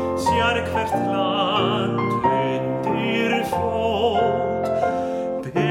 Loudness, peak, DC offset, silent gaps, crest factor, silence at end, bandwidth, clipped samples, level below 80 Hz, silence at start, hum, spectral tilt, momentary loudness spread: -21 LUFS; -6 dBFS; under 0.1%; none; 16 dB; 0 s; 16.5 kHz; under 0.1%; -48 dBFS; 0 s; none; -6 dB/octave; 4 LU